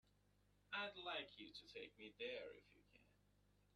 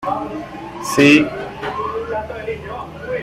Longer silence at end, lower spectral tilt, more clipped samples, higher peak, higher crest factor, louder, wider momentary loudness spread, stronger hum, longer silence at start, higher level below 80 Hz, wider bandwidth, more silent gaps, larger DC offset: first, 0.25 s vs 0 s; second, -3.5 dB/octave vs -5 dB/octave; neither; second, -36 dBFS vs -2 dBFS; about the same, 20 dB vs 18 dB; second, -52 LUFS vs -18 LUFS; second, 11 LU vs 18 LU; first, 50 Hz at -75 dBFS vs none; first, 0.7 s vs 0 s; second, -82 dBFS vs -46 dBFS; second, 10 kHz vs 15 kHz; neither; neither